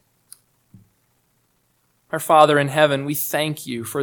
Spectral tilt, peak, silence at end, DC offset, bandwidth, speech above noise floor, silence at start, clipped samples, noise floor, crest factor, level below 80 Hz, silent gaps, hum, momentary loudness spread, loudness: -4.5 dB/octave; 0 dBFS; 0 s; under 0.1%; 19 kHz; 47 dB; 2.15 s; under 0.1%; -65 dBFS; 22 dB; -68 dBFS; none; none; 15 LU; -18 LUFS